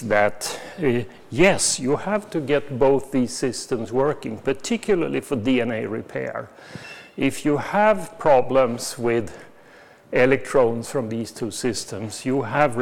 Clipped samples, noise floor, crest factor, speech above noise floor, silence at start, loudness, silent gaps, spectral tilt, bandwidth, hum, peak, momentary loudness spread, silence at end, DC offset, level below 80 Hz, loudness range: under 0.1%; -49 dBFS; 18 dB; 27 dB; 0 s; -22 LUFS; none; -4.5 dB/octave; 17.5 kHz; none; -4 dBFS; 11 LU; 0 s; under 0.1%; -50 dBFS; 3 LU